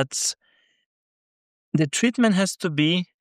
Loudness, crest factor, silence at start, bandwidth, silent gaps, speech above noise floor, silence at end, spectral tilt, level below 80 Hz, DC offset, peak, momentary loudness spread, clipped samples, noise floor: -22 LUFS; 18 dB; 0 s; 15.5 kHz; 0.86-1.72 s; over 68 dB; 0.15 s; -4 dB/octave; -72 dBFS; under 0.1%; -6 dBFS; 7 LU; under 0.1%; under -90 dBFS